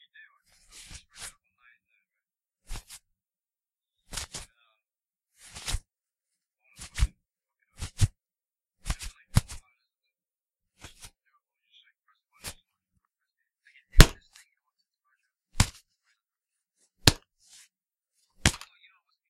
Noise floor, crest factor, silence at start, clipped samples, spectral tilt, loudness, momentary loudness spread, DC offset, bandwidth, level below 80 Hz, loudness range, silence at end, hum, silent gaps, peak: under -90 dBFS; 32 dB; 1.2 s; under 0.1%; -3.5 dB/octave; -28 LUFS; 25 LU; under 0.1%; 16 kHz; -36 dBFS; 21 LU; 0.75 s; none; none; 0 dBFS